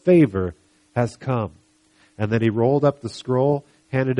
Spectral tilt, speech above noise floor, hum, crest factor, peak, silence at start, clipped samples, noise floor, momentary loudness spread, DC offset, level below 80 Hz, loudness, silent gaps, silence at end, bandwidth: -8.5 dB/octave; 39 dB; none; 16 dB; -6 dBFS; 0.05 s; under 0.1%; -58 dBFS; 12 LU; under 0.1%; -54 dBFS; -22 LUFS; none; 0 s; 11 kHz